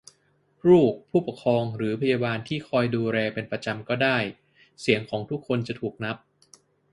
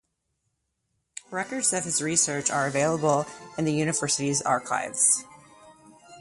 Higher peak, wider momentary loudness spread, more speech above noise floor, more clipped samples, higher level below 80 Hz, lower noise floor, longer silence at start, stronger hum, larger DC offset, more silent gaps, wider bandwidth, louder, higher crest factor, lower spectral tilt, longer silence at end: first, -4 dBFS vs -8 dBFS; about the same, 12 LU vs 11 LU; second, 41 dB vs 52 dB; neither; about the same, -62 dBFS vs -66 dBFS; second, -66 dBFS vs -77 dBFS; second, 0.65 s vs 1.3 s; neither; neither; neither; about the same, 11.5 kHz vs 11.5 kHz; about the same, -25 LUFS vs -25 LUFS; about the same, 22 dB vs 20 dB; first, -7 dB/octave vs -3 dB/octave; first, 0.75 s vs 0 s